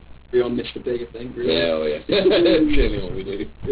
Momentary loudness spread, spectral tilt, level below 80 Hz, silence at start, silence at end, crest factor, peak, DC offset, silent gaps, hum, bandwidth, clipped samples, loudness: 13 LU; -10 dB/octave; -32 dBFS; 0.1 s; 0 s; 14 dB; -6 dBFS; 0.3%; none; none; 4 kHz; under 0.1%; -21 LUFS